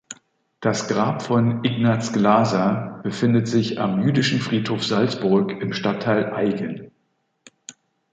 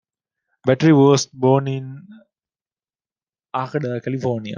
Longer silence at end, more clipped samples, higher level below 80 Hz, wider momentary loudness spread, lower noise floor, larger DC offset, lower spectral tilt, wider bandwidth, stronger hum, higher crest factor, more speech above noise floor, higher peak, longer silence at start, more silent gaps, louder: first, 0.4 s vs 0 s; neither; first, -60 dBFS vs -66 dBFS; second, 10 LU vs 15 LU; second, -70 dBFS vs under -90 dBFS; neither; about the same, -6 dB/octave vs -6.5 dB/octave; about the same, 9 kHz vs 9.8 kHz; neither; about the same, 18 dB vs 18 dB; second, 50 dB vs over 72 dB; about the same, -4 dBFS vs -2 dBFS; second, 0.1 s vs 0.65 s; second, none vs 2.61-2.65 s; second, -21 LUFS vs -18 LUFS